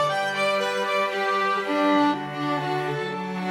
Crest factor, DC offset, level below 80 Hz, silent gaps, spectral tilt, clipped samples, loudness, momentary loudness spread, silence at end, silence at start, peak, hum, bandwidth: 16 dB; under 0.1%; -72 dBFS; none; -5 dB/octave; under 0.1%; -24 LUFS; 7 LU; 0 s; 0 s; -8 dBFS; none; 16 kHz